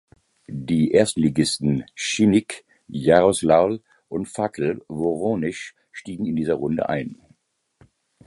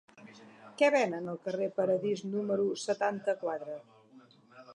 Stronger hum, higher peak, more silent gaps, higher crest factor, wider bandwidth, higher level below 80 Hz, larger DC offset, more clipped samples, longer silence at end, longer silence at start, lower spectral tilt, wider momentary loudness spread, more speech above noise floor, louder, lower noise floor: neither; first, -2 dBFS vs -12 dBFS; neither; about the same, 20 dB vs 20 dB; about the same, 11.5 kHz vs 11 kHz; first, -52 dBFS vs -86 dBFS; neither; neither; first, 1.15 s vs 0 s; first, 0.5 s vs 0.15 s; about the same, -5.5 dB/octave vs -5 dB/octave; first, 18 LU vs 15 LU; first, 43 dB vs 28 dB; first, -21 LUFS vs -32 LUFS; first, -64 dBFS vs -59 dBFS